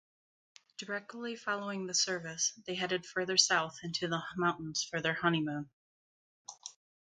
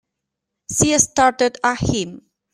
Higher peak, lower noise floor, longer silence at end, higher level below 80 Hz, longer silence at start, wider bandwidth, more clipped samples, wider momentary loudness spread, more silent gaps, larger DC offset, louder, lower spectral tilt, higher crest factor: second, -10 dBFS vs 0 dBFS; first, under -90 dBFS vs -81 dBFS; about the same, 0.35 s vs 0.35 s; second, -74 dBFS vs -42 dBFS; about the same, 0.8 s vs 0.7 s; second, 10.5 kHz vs 15.5 kHz; neither; first, 19 LU vs 10 LU; first, 5.73-6.45 s vs none; neither; second, -33 LUFS vs -17 LUFS; about the same, -2.5 dB/octave vs -3 dB/octave; first, 26 dB vs 20 dB